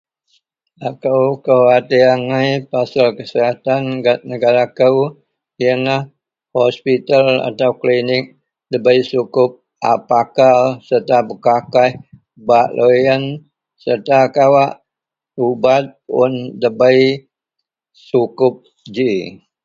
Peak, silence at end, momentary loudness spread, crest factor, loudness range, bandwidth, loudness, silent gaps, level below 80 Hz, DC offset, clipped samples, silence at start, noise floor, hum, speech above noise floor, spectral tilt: 0 dBFS; 0.3 s; 11 LU; 14 dB; 2 LU; 7.4 kHz; -14 LUFS; none; -60 dBFS; under 0.1%; under 0.1%; 0.8 s; -84 dBFS; none; 70 dB; -6.5 dB/octave